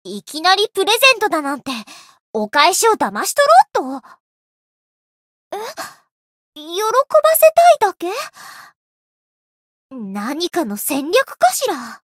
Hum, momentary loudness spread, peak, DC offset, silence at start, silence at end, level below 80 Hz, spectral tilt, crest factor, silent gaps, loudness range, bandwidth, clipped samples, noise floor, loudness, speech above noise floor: none; 18 LU; 0 dBFS; under 0.1%; 0.05 s; 0.15 s; -70 dBFS; -1.5 dB/octave; 18 dB; 2.20-2.33 s, 4.20-5.51 s, 6.11-6.53 s, 8.75-9.89 s; 9 LU; 16.5 kHz; under 0.1%; under -90 dBFS; -15 LUFS; over 74 dB